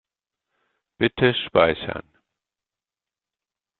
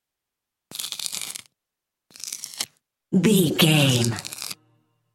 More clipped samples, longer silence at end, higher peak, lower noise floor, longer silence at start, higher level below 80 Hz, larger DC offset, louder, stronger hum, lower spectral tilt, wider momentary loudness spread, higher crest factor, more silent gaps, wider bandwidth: neither; first, 1.8 s vs 0.6 s; about the same, -2 dBFS vs -2 dBFS; first, under -90 dBFS vs -85 dBFS; first, 1 s vs 0.7 s; first, -54 dBFS vs -64 dBFS; neither; about the same, -21 LUFS vs -23 LUFS; neither; about the same, -3.5 dB/octave vs -4.5 dB/octave; second, 13 LU vs 17 LU; about the same, 24 dB vs 24 dB; neither; second, 4.4 kHz vs 17 kHz